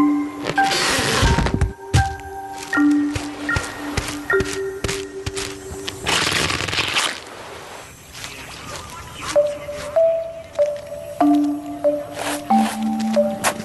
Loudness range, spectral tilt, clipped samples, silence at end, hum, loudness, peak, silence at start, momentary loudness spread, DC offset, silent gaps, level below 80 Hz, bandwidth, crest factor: 5 LU; -4 dB/octave; under 0.1%; 0 s; none; -20 LUFS; -4 dBFS; 0 s; 15 LU; under 0.1%; none; -34 dBFS; 12.5 kHz; 18 dB